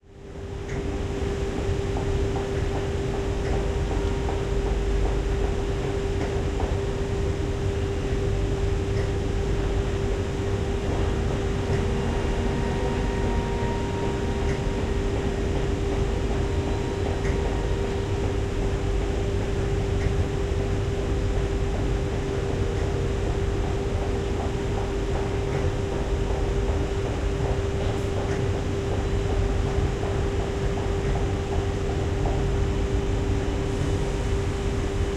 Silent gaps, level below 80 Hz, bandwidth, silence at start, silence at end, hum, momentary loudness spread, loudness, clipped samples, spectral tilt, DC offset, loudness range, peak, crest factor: none; -30 dBFS; 11 kHz; 0.1 s; 0 s; none; 2 LU; -27 LUFS; under 0.1%; -6.5 dB/octave; under 0.1%; 1 LU; -12 dBFS; 14 dB